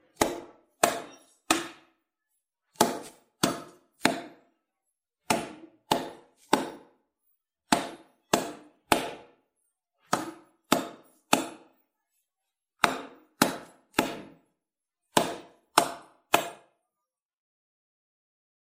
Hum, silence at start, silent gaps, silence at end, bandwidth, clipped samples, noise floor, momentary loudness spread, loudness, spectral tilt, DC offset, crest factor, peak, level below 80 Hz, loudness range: none; 0.2 s; none; 2.2 s; 16 kHz; under 0.1%; -88 dBFS; 15 LU; -29 LUFS; -2.5 dB/octave; under 0.1%; 30 dB; -2 dBFS; -64 dBFS; 3 LU